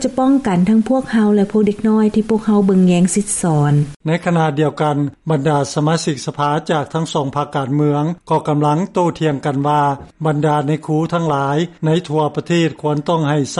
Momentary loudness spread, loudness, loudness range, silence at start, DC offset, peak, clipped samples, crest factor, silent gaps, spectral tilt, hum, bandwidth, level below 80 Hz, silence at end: 5 LU; -16 LUFS; 3 LU; 0 s; under 0.1%; -4 dBFS; under 0.1%; 10 dB; 3.96-4.00 s; -6.5 dB/octave; none; 11.5 kHz; -50 dBFS; 0 s